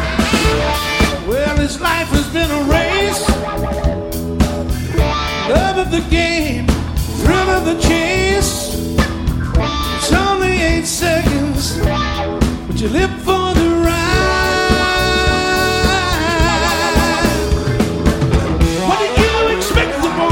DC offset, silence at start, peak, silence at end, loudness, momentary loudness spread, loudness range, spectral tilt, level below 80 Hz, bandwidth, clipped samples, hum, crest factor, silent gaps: under 0.1%; 0 s; 0 dBFS; 0 s; -15 LUFS; 4 LU; 3 LU; -4.5 dB/octave; -22 dBFS; 17 kHz; under 0.1%; none; 14 dB; none